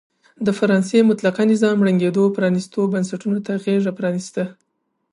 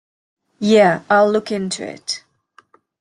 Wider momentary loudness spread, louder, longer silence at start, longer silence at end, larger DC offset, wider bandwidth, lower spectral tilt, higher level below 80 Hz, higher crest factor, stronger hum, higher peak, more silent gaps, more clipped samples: second, 8 LU vs 13 LU; about the same, -19 LUFS vs -17 LUFS; second, 0.4 s vs 0.6 s; second, 0.6 s vs 0.8 s; neither; about the same, 11 kHz vs 11.5 kHz; first, -7 dB/octave vs -4.5 dB/octave; second, -68 dBFS vs -62 dBFS; about the same, 16 dB vs 16 dB; neither; about the same, -4 dBFS vs -2 dBFS; neither; neither